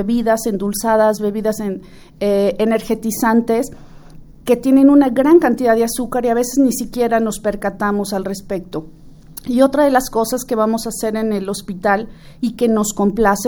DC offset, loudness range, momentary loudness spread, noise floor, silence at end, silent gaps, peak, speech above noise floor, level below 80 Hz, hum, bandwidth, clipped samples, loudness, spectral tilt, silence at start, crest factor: under 0.1%; 5 LU; 13 LU; -38 dBFS; 0 s; none; 0 dBFS; 22 dB; -42 dBFS; none; over 20 kHz; under 0.1%; -16 LUFS; -5 dB/octave; 0 s; 16 dB